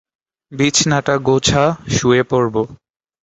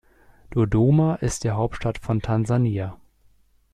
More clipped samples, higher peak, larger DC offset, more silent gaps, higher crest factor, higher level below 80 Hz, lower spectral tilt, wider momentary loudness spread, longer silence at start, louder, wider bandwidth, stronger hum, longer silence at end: neither; first, 0 dBFS vs -8 dBFS; neither; neither; about the same, 16 dB vs 14 dB; about the same, -42 dBFS vs -42 dBFS; second, -4 dB/octave vs -7.5 dB/octave; about the same, 8 LU vs 10 LU; about the same, 0.5 s vs 0.5 s; first, -15 LUFS vs -23 LUFS; second, 8.2 kHz vs 12 kHz; neither; second, 0.5 s vs 0.8 s